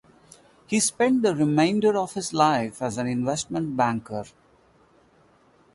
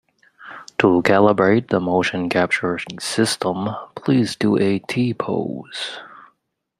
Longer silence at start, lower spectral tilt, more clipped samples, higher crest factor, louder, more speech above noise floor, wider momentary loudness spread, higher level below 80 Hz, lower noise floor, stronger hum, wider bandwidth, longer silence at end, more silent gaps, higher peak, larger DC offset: first, 0.7 s vs 0.4 s; about the same, -4.5 dB/octave vs -5.5 dB/octave; neither; about the same, 18 dB vs 20 dB; second, -23 LUFS vs -19 LUFS; second, 36 dB vs 49 dB; second, 9 LU vs 13 LU; about the same, -62 dBFS vs -58 dBFS; second, -59 dBFS vs -68 dBFS; neither; second, 11.5 kHz vs 14 kHz; first, 1.45 s vs 0.55 s; neither; second, -6 dBFS vs 0 dBFS; neither